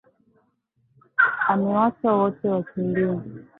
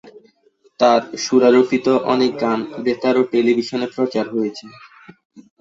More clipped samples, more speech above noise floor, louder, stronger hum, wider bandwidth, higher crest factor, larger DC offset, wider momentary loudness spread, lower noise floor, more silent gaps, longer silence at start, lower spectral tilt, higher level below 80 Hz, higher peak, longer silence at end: neither; first, 45 dB vs 40 dB; second, -22 LUFS vs -17 LUFS; neither; second, 4 kHz vs 7.8 kHz; about the same, 18 dB vs 16 dB; neither; second, 6 LU vs 9 LU; first, -68 dBFS vs -57 dBFS; second, none vs 5.25-5.30 s; first, 1.2 s vs 0.05 s; first, -11.5 dB/octave vs -5 dB/octave; about the same, -64 dBFS vs -62 dBFS; second, -6 dBFS vs -2 dBFS; about the same, 0.2 s vs 0.2 s